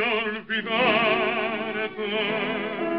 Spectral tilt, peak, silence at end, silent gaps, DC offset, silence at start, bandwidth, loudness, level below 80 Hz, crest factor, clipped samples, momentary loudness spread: -1.5 dB/octave; -8 dBFS; 0 s; none; 0.2%; 0 s; 5.8 kHz; -24 LUFS; -62 dBFS; 16 dB; under 0.1%; 8 LU